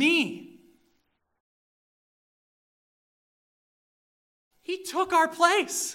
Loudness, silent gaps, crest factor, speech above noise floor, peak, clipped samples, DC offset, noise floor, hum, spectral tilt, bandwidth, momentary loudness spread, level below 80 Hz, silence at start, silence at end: -25 LUFS; 1.40-4.51 s; 22 dB; 49 dB; -8 dBFS; under 0.1%; under 0.1%; -73 dBFS; none; -1.5 dB/octave; 16 kHz; 17 LU; -76 dBFS; 0 s; 0 s